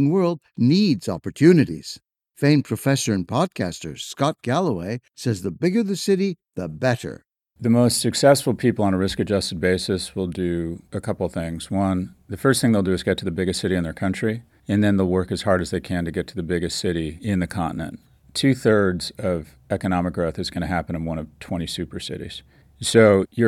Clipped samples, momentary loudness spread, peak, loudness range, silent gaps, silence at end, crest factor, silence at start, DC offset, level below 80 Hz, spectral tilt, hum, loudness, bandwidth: under 0.1%; 12 LU; -2 dBFS; 4 LU; none; 0 s; 20 dB; 0 s; under 0.1%; -50 dBFS; -5.5 dB/octave; none; -22 LUFS; 15 kHz